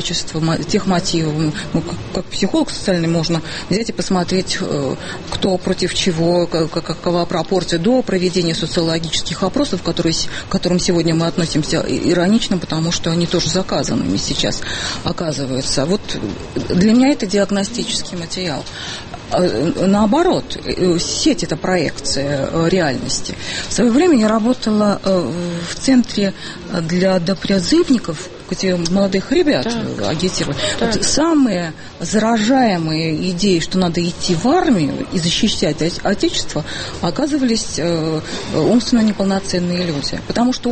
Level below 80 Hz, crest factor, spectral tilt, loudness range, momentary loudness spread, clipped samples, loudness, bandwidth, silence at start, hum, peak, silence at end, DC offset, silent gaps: -36 dBFS; 16 dB; -4.5 dB/octave; 3 LU; 8 LU; under 0.1%; -17 LUFS; 8.8 kHz; 0 s; none; 0 dBFS; 0 s; under 0.1%; none